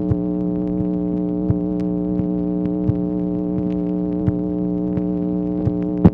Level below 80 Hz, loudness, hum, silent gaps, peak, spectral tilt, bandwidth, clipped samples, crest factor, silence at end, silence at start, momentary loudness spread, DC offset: -38 dBFS; -21 LUFS; none; none; 0 dBFS; -12.5 dB/octave; 3.4 kHz; under 0.1%; 18 dB; 0 s; 0 s; 1 LU; under 0.1%